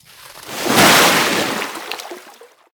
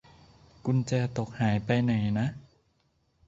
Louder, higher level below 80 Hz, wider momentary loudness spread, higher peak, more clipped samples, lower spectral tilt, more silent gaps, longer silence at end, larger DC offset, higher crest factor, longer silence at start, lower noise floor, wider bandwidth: first, -13 LUFS vs -29 LUFS; about the same, -52 dBFS vs -56 dBFS; first, 20 LU vs 8 LU; first, 0 dBFS vs -12 dBFS; neither; second, -2 dB/octave vs -7.5 dB/octave; neither; second, 0.5 s vs 0.85 s; neither; about the same, 18 dB vs 18 dB; second, 0.3 s vs 0.65 s; second, -44 dBFS vs -71 dBFS; first, over 20 kHz vs 7.8 kHz